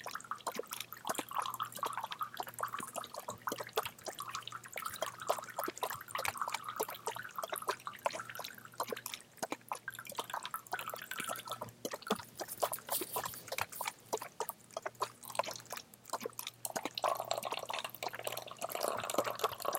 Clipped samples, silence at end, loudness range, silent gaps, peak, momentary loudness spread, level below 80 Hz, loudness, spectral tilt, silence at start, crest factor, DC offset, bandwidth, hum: under 0.1%; 0 s; 2 LU; none; -16 dBFS; 7 LU; -80 dBFS; -41 LUFS; -1.5 dB/octave; 0 s; 26 dB; under 0.1%; 17 kHz; none